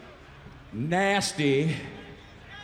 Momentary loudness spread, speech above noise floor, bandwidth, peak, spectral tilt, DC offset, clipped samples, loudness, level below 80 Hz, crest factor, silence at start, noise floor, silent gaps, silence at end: 24 LU; 22 dB; 14 kHz; -12 dBFS; -4.5 dB/octave; under 0.1%; under 0.1%; -26 LUFS; -56 dBFS; 16 dB; 0 s; -48 dBFS; none; 0 s